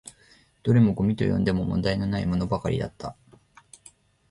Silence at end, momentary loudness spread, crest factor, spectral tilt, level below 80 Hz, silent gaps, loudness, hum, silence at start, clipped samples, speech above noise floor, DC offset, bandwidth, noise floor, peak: 1.2 s; 15 LU; 18 dB; -7.5 dB/octave; -44 dBFS; none; -25 LUFS; none; 0.05 s; under 0.1%; 35 dB; under 0.1%; 11.5 kHz; -58 dBFS; -8 dBFS